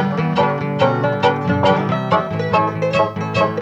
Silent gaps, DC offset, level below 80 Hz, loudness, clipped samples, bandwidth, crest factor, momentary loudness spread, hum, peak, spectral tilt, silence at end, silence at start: none; under 0.1%; -52 dBFS; -17 LUFS; under 0.1%; 8.4 kHz; 16 dB; 3 LU; none; -2 dBFS; -7 dB/octave; 0 s; 0 s